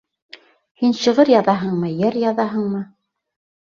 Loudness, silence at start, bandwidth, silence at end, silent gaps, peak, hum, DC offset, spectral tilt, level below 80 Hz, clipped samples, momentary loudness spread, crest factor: -18 LUFS; 0.8 s; 7.4 kHz; 0.8 s; none; -2 dBFS; none; under 0.1%; -6.5 dB/octave; -62 dBFS; under 0.1%; 11 LU; 18 dB